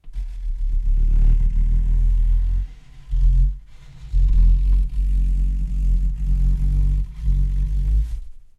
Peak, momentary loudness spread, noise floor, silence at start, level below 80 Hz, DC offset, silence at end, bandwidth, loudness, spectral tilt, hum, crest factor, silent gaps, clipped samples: -6 dBFS; 10 LU; -38 dBFS; 0.05 s; -18 dBFS; under 0.1%; 0.2 s; 1.1 kHz; -23 LUFS; -8.5 dB/octave; none; 12 dB; none; under 0.1%